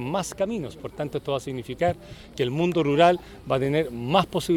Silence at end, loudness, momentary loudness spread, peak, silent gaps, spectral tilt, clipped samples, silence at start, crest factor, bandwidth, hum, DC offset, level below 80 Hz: 0 s; -25 LUFS; 14 LU; -4 dBFS; none; -6 dB/octave; under 0.1%; 0 s; 20 dB; 17.5 kHz; none; under 0.1%; -50 dBFS